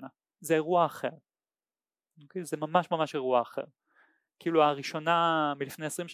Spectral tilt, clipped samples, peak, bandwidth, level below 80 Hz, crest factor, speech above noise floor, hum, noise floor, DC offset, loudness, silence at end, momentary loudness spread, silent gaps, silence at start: -5 dB/octave; under 0.1%; -10 dBFS; 16 kHz; -86 dBFS; 20 dB; over 61 dB; none; under -90 dBFS; under 0.1%; -29 LUFS; 0 s; 15 LU; none; 0 s